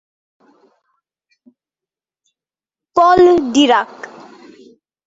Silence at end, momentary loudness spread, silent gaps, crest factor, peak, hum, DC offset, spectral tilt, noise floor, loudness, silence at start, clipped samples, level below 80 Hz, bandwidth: 1 s; 22 LU; none; 18 dB; 0 dBFS; none; under 0.1%; -4 dB/octave; -90 dBFS; -12 LUFS; 2.95 s; under 0.1%; -54 dBFS; 8 kHz